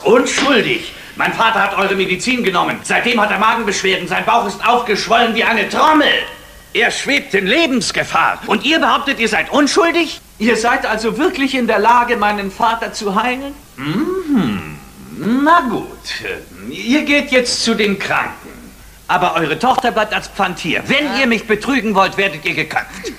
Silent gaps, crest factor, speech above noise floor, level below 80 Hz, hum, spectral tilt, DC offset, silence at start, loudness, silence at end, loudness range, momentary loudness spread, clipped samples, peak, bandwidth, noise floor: none; 16 dB; 23 dB; -44 dBFS; none; -3.5 dB/octave; under 0.1%; 0 s; -14 LUFS; 0 s; 4 LU; 10 LU; under 0.1%; 0 dBFS; 15.5 kHz; -38 dBFS